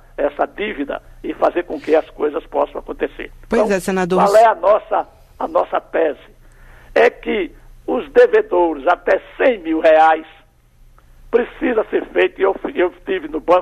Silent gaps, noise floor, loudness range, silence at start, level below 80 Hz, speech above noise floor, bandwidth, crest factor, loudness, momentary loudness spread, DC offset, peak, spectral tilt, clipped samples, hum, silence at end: none; -49 dBFS; 5 LU; 0.2 s; -44 dBFS; 32 dB; 13.5 kHz; 16 dB; -17 LUFS; 13 LU; under 0.1%; -2 dBFS; -5.5 dB/octave; under 0.1%; none; 0 s